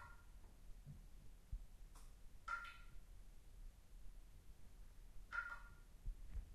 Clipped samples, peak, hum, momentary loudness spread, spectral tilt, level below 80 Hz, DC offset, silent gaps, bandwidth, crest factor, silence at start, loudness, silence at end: under 0.1%; -34 dBFS; none; 17 LU; -4 dB/octave; -58 dBFS; under 0.1%; none; 13 kHz; 20 dB; 0 s; -57 LUFS; 0 s